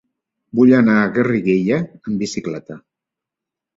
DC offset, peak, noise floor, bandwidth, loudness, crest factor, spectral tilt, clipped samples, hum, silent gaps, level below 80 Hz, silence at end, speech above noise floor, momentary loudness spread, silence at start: under 0.1%; -2 dBFS; -85 dBFS; 7.8 kHz; -16 LUFS; 16 dB; -7 dB/octave; under 0.1%; none; none; -56 dBFS; 1 s; 69 dB; 14 LU; 0.55 s